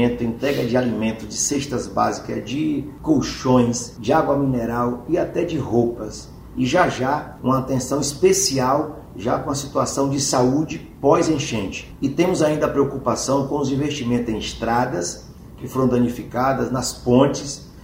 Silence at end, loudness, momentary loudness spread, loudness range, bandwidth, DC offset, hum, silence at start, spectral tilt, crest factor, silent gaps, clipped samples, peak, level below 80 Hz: 0 s; -21 LUFS; 9 LU; 2 LU; 16 kHz; under 0.1%; none; 0 s; -5 dB/octave; 20 dB; none; under 0.1%; -2 dBFS; -44 dBFS